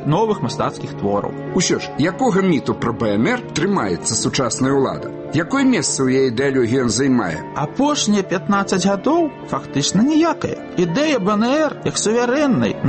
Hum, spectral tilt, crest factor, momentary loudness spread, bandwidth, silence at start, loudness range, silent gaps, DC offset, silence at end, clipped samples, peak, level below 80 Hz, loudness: none; -4.5 dB/octave; 12 dB; 6 LU; 8.8 kHz; 0 s; 2 LU; none; under 0.1%; 0 s; under 0.1%; -6 dBFS; -48 dBFS; -18 LUFS